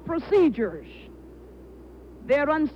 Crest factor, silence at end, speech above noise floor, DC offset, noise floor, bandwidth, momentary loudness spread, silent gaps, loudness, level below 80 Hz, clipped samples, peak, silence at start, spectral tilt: 16 dB; 0 s; 22 dB; under 0.1%; -45 dBFS; 7.4 kHz; 24 LU; none; -23 LUFS; -50 dBFS; under 0.1%; -10 dBFS; 0 s; -7.5 dB/octave